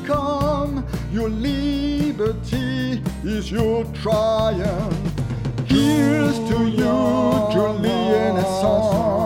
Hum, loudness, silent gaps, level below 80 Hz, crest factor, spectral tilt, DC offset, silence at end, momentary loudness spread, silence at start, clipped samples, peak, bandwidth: none; -20 LUFS; none; -34 dBFS; 14 dB; -6.5 dB/octave; under 0.1%; 0 s; 7 LU; 0 s; under 0.1%; -6 dBFS; 17 kHz